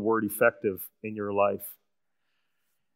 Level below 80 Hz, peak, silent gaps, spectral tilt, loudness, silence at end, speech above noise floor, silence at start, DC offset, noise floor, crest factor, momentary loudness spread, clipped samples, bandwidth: -76 dBFS; -8 dBFS; none; -6 dB/octave; -28 LUFS; 1.25 s; 54 dB; 0 s; under 0.1%; -83 dBFS; 22 dB; 13 LU; under 0.1%; 16 kHz